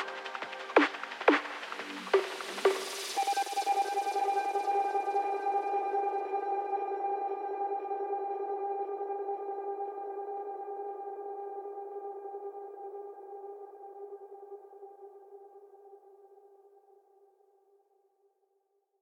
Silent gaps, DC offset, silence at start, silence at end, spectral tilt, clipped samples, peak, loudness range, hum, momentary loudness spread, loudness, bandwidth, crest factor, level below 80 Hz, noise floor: none; under 0.1%; 0 s; 2.45 s; -1.5 dB/octave; under 0.1%; -8 dBFS; 18 LU; none; 18 LU; -33 LUFS; 16.5 kHz; 26 dB; under -90 dBFS; -77 dBFS